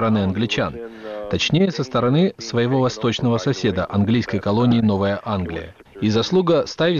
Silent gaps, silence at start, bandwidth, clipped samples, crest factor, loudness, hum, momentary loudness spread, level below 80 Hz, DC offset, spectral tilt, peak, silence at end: none; 0 s; 7.2 kHz; under 0.1%; 12 dB; -20 LUFS; none; 9 LU; -48 dBFS; under 0.1%; -6.5 dB/octave; -8 dBFS; 0 s